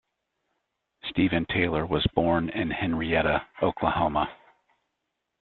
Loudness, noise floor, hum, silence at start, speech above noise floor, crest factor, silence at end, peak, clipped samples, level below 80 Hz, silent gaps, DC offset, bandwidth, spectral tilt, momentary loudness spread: -26 LUFS; -81 dBFS; none; 1.05 s; 56 dB; 22 dB; 1.1 s; -6 dBFS; under 0.1%; -48 dBFS; none; under 0.1%; 4.4 kHz; -9.5 dB/octave; 5 LU